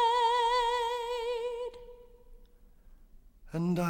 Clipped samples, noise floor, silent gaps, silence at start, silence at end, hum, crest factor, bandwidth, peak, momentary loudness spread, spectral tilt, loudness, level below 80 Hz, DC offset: under 0.1%; -57 dBFS; none; 0 s; 0 s; none; 14 dB; 16.5 kHz; -18 dBFS; 16 LU; -5 dB/octave; -31 LUFS; -54 dBFS; under 0.1%